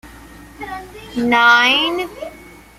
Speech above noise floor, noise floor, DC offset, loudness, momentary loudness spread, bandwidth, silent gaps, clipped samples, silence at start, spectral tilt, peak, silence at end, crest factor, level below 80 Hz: 24 dB; -39 dBFS; under 0.1%; -13 LUFS; 23 LU; 15.5 kHz; none; under 0.1%; 0.05 s; -2.5 dB/octave; -2 dBFS; 0.35 s; 18 dB; -46 dBFS